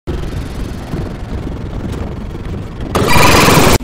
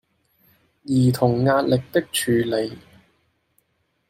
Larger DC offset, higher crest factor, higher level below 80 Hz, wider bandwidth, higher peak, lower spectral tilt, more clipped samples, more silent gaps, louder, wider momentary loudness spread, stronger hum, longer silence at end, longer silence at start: neither; about the same, 14 dB vs 18 dB; first, -24 dBFS vs -58 dBFS; about the same, 16.5 kHz vs 16 kHz; first, 0 dBFS vs -4 dBFS; second, -4.5 dB/octave vs -6 dB/octave; neither; neither; first, -14 LUFS vs -21 LUFS; first, 17 LU vs 8 LU; neither; second, 0 s vs 1.3 s; second, 0.05 s vs 0.85 s